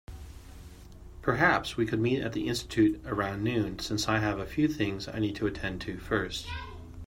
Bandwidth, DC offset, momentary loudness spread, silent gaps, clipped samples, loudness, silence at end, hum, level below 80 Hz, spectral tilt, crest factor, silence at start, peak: 16 kHz; under 0.1%; 20 LU; none; under 0.1%; -30 LUFS; 0 s; none; -48 dBFS; -5.5 dB/octave; 20 dB; 0.1 s; -10 dBFS